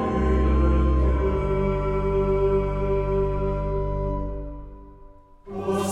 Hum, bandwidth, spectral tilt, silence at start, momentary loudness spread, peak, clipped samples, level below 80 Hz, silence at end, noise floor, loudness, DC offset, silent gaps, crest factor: none; 11 kHz; -8 dB/octave; 0 s; 12 LU; -10 dBFS; under 0.1%; -26 dBFS; 0 s; -47 dBFS; -24 LUFS; under 0.1%; none; 12 dB